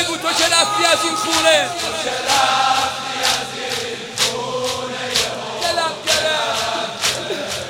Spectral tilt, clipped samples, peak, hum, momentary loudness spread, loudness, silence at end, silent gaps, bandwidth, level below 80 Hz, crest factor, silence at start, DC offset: -1 dB/octave; under 0.1%; 0 dBFS; none; 9 LU; -17 LUFS; 0 s; none; 17 kHz; -54 dBFS; 18 dB; 0 s; under 0.1%